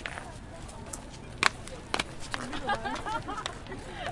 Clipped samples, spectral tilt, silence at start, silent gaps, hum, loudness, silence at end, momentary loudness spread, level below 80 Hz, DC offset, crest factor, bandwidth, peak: under 0.1%; -3 dB/octave; 0 s; none; none; -34 LUFS; 0 s; 16 LU; -48 dBFS; under 0.1%; 32 dB; 11.5 kHz; -2 dBFS